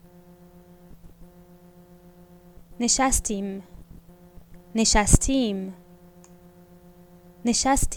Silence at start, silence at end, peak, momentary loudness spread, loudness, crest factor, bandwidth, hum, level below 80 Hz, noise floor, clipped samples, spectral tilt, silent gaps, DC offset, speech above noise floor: 0.95 s; 0 s; 0 dBFS; 14 LU; -23 LUFS; 26 dB; 19 kHz; none; -34 dBFS; -51 dBFS; under 0.1%; -3.5 dB/octave; none; under 0.1%; 29 dB